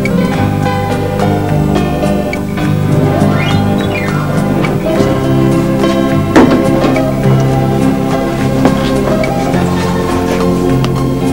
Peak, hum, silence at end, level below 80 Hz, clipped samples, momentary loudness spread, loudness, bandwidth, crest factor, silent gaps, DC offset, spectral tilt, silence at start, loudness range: 0 dBFS; none; 0 s; -28 dBFS; 0.3%; 3 LU; -12 LUFS; 16.5 kHz; 10 dB; none; 2%; -7 dB/octave; 0 s; 2 LU